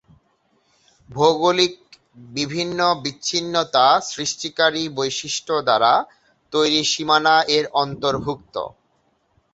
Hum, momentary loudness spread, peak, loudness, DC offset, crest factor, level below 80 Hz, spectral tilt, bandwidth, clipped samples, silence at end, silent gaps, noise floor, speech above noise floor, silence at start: none; 12 LU; -2 dBFS; -19 LUFS; under 0.1%; 20 dB; -58 dBFS; -3 dB/octave; 8.2 kHz; under 0.1%; 0.85 s; none; -65 dBFS; 45 dB; 1.1 s